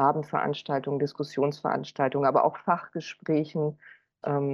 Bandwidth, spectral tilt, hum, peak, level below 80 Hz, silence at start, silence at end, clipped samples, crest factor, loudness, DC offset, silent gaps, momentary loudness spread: 7.4 kHz; -7.5 dB/octave; none; -10 dBFS; -76 dBFS; 0 s; 0 s; under 0.1%; 18 dB; -28 LUFS; under 0.1%; none; 8 LU